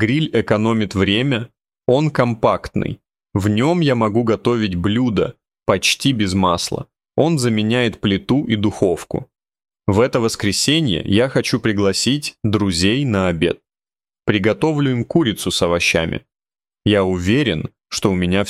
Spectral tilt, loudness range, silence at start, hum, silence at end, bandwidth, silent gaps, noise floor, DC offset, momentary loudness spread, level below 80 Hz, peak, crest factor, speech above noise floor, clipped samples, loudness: -5 dB/octave; 2 LU; 0 s; none; 0 s; 15.5 kHz; none; under -90 dBFS; under 0.1%; 9 LU; -44 dBFS; -2 dBFS; 16 dB; over 73 dB; under 0.1%; -18 LUFS